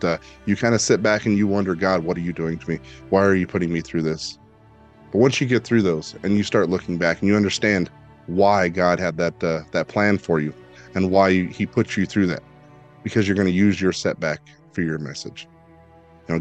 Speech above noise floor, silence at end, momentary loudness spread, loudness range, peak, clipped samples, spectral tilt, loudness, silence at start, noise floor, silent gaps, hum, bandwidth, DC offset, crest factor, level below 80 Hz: 29 dB; 0 s; 11 LU; 3 LU; -2 dBFS; under 0.1%; -5.5 dB/octave; -21 LUFS; 0 s; -50 dBFS; none; none; 8.8 kHz; under 0.1%; 18 dB; -54 dBFS